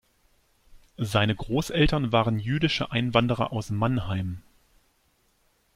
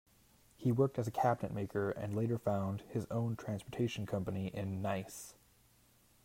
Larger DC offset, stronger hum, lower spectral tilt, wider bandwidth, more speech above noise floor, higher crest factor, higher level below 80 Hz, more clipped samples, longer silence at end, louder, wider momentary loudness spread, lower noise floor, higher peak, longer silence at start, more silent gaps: neither; neither; about the same, -6 dB/octave vs -7 dB/octave; about the same, 15.5 kHz vs 16 kHz; first, 43 dB vs 32 dB; about the same, 22 dB vs 20 dB; first, -42 dBFS vs -68 dBFS; neither; first, 1.35 s vs 0.9 s; first, -26 LUFS vs -37 LUFS; about the same, 8 LU vs 8 LU; about the same, -67 dBFS vs -68 dBFS; first, -4 dBFS vs -18 dBFS; about the same, 0.7 s vs 0.6 s; neither